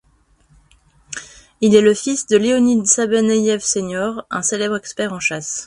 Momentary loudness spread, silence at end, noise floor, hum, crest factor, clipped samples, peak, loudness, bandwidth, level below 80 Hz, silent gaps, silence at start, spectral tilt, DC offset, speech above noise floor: 11 LU; 0 s; -56 dBFS; none; 18 dB; under 0.1%; 0 dBFS; -16 LUFS; 11.5 kHz; -54 dBFS; none; 1.1 s; -3.5 dB/octave; under 0.1%; 40 dB